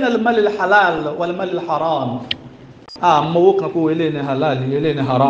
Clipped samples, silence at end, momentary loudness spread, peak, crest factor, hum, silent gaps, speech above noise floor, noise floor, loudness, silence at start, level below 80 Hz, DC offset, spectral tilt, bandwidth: under 0.1%; 0 s; 9 LU; 0 dBFS; 16 dB; none; none; 23 dB; -39 dBFS; -17 LUFS; 0 s; -56 dBFS; under 0.1%; -7 dB/octave; 7.6 kHz